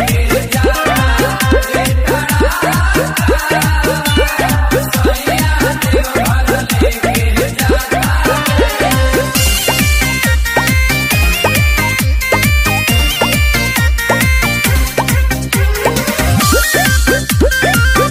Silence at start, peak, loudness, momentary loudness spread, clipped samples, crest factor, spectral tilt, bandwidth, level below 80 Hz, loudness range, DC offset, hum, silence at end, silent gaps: 0 s; 0 dBFS; -12 LUFS; 3 LU; under 0.1%; 12 dB; -4 dB/octave; 16.5 kHz; -18 dBFS; 1 LU; under 0.1%; none; 0 s; none